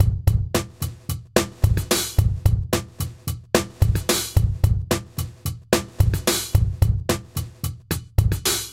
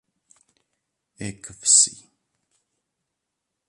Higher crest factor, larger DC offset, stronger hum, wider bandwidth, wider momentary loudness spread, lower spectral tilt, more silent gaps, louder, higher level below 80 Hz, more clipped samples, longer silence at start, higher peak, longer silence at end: second, 18 dB vs 24 dB; first, 0.1% vs under 0.1%; neither; first, 17 kHz vs 11.5 kHz; second, 11 LU vs 21 LU; first, -4.5 dB/octave vs 0 dB/octave; neither; second, -23 LUFS vs -17 LUFS; first, -28 dBFS vs -64 dBFS; neither; second, 0 s vs 1.2 s; about the same, -4 dBFS vs -4 dBFS; second, 0 s vs 1.75 s